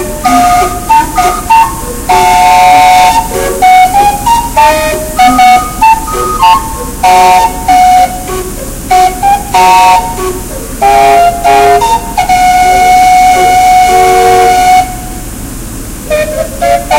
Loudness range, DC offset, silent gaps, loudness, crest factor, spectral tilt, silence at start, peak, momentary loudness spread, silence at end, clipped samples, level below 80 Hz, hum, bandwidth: 2 LU; under 0.1%; none; -6 LUFS; 6 dB; -3 dB/octave; 0 s; 0 dBFS; 13 LU; 0 s; 5%; -24 dBFS; none; 17 kHz